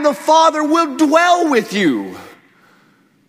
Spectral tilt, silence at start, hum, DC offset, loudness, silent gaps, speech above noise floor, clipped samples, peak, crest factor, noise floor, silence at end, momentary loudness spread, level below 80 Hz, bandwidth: -4 dB/octave; 0 s; none; under 0.1%; -14 LUFS; none; 40 dB; under 0.1%; 0 dBFS; 16 dB; -54 dBFS; 1 s; 6 LU; -66 dBFS; 16 kHz